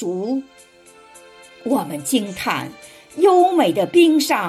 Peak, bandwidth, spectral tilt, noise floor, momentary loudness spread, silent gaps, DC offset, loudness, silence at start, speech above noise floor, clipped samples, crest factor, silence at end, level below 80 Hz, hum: -4 dBFS; 15 kHz; -4 dB/octave; -46 dBFS; 13 LU; none; under 0.1%; -18 LUFS; 0 s; 28 dB; under 0.1%; 16 dB; 0 s; -64 dBFS; none